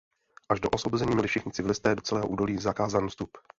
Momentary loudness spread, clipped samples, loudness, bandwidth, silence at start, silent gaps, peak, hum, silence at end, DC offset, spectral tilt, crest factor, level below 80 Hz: 4 LU; under 0.1%; -28 LUFS; 8 kHz; 0.5 s; none; -8 dBFS; none; 0.2 s; under 0.1%; -5.5 dB/octave; 20 dB; -52 dBFS